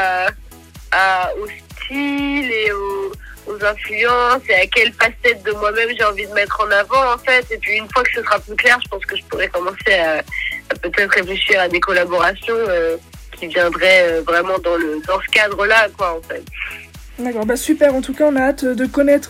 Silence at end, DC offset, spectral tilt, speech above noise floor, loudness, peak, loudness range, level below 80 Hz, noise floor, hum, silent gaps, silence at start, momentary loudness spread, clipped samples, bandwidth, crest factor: 0 s; under 0.1%; -3.5 dB/octave; 22 dB; -16 LUFS; -2 dBFS; 4 LU; -40 dBFS; -38 dBFS; none; none; 0 s; 12 LU; under 0.1%; 17 kHz; 14 dB